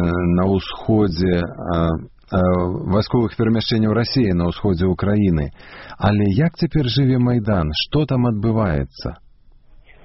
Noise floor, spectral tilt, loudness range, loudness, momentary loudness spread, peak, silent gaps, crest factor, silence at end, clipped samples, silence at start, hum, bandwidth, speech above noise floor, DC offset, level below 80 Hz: -47 dBFS; -6.5 dB/octave; 1 LU; -19 LUFS; 6 LU; -4 dBFS; none; 14 dB; 0.9 s; under 0.1%; 0 s; none; 6 kHz; 29 dB; under 0.1%; -36 dBFS